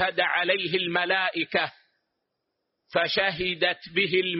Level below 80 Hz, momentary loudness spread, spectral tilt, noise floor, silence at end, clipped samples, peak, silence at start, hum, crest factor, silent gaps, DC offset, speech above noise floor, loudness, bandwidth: -64 dBFS; 4 LU; -1 dB/octave; -80 dBFS; 0 s; under 0.1%; -10 dBFS; 0 s; none; 18 dB; none; under 0.1%; 55 dB; -25 LUFS; 5.8 kHz